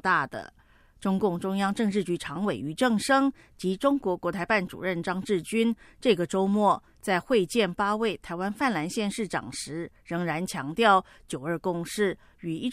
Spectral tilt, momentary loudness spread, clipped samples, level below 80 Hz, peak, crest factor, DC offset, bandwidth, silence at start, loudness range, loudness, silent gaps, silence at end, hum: -5 dB/octave; 10 LU; under 0.1%; -58 dBFS; -8 dBFS; 20 dB; under 0.1%; 15.5 kHz; 0.05 s; 2 LU; -27 LUFS; none; 0 s; none